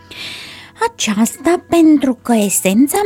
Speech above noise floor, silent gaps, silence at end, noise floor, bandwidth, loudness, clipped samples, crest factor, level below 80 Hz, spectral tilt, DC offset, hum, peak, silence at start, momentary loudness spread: 20 dB; none; 0 s; -33 dBFS; 17.5 kHz; -14 LUFS; under 0.1%; 14 dB; -52 dBFS; -4 dB/octave; under 0.1%; none; -2 dBFS; 0.1 s; 16 LU